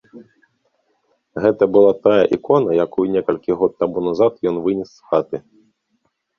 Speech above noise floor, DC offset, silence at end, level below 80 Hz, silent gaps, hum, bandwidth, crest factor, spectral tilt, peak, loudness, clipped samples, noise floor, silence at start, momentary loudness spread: 52 dB; under 0.1%; 1 s; -56 dBFS; none; none; 6.6 kHz; 16 dB; -8 dB/octave; -2 dBFS; -17 LUFS; under 0.1%; -68 dBFS; 0.15 s; 9 LU